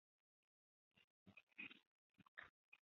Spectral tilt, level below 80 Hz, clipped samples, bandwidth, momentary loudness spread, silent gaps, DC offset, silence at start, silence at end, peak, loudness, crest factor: -1 dB/octave; under -90 dBFS; under 0.1%; 6 kHz; 12 LU; 1.04-1.26 s, 1.43-1.47 s, 1.87-2.14 s, 2.28-2.37 s, 2.50-2.72 s; under 0.1%; 0.95 s; 0.2 s; -42 dBFS; -61 LUFS; 24 dB